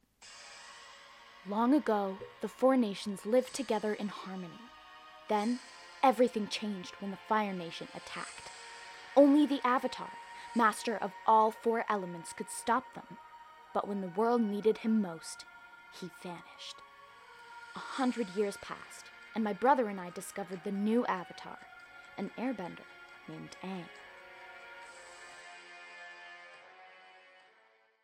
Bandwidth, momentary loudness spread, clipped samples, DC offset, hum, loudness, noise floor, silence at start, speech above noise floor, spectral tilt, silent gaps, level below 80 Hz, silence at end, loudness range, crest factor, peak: 16 kHz; 23 LU; under 0.1%; under 0.1%; none; -33 LUFS; -67 dBFS; 0.2 s; 35 dB; -5 dB/octave; none; -78 dBFS; 1.1 s; 15 LU; 22 dB; -12 dBFS